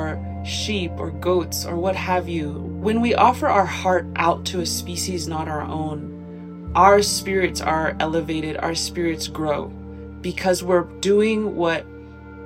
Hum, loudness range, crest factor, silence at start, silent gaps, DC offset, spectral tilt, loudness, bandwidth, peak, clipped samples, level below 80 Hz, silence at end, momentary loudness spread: none; 3 LU; 20 dB; 0 s; none; under 0.1%; -4.5 dB/octave; -21 LUFS; 16 kHz; -2 dBFS; under 0.1%; -42 dBFS; 0 s; 13 LU